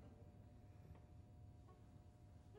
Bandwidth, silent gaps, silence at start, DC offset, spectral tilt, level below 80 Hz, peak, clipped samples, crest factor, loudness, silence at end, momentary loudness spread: 16 kHz; none; 0 s; under 0.1%; -8 dB/octave; -68 dBFS; -50 dBFS; under 0.1%; 14 dB; -64 LUFS; 0 s; 2 LU